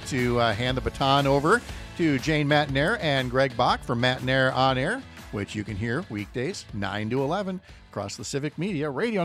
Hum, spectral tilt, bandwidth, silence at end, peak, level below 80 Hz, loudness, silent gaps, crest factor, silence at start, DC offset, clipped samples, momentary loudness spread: none; -5.5 dB/octave; 15 kHz; 0 s; -8 dBFS; -46 dBFS; -25 LUFS; none; 18 dB; 0 s; under 0.1%; under 0.1%; 11 LU